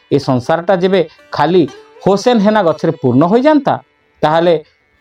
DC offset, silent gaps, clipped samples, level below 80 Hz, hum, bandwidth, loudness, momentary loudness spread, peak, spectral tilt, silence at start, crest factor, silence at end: under 0.1%; none; under 0.1%; -52 dBFS; none; 10.5 kHz; -13 LUFS; 8 LU; 0 dBFS; -7 dB/octave; 0.1 s; 12 dB; 0.4 s